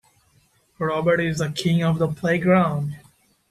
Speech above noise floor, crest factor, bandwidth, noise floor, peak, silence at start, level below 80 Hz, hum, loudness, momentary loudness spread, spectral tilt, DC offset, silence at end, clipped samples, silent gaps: 41 dB; 16 dB; 13.5 kHz; -61 dBFS; -6 dBFS; 0.8 s; -54 dBFS; none; -22 LUFS; 10 LU; -6.5 dB/octave; under 0.1%; 0.5 s; under 0.1%; none